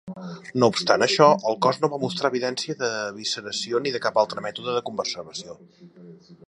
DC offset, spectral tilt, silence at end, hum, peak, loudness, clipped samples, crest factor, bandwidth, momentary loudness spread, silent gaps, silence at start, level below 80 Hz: under 0.1%; -4 dB/octave; 0.15 s; none; -2 dBFS; -23 LUFS; under 0.1%; 22 dB; 11 kHz; 15 LU; none; 0.05 s; -68 dBFS